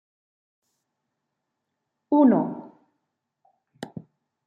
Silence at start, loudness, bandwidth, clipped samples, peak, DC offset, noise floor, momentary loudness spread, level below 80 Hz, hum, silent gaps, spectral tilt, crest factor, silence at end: 2.1 s; -21 LUFS; 7.8 kHz; under 0.1%; -6 dBFS; under 0.1%; -81 dBFS; 23 LU; -78 dBFS; none; none; -9 dB/octave; 22 dB; 0.6 s